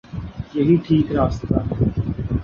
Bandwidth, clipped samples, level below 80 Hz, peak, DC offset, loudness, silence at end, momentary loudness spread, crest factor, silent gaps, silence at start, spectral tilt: 7 kHz; under 0.1%; -32 dBFS; -4 dBFS; under 0.1%; -20 LUFS; 0 s; 11 LU; 16 dB; none; 0.1 s; -9.5 dB/octave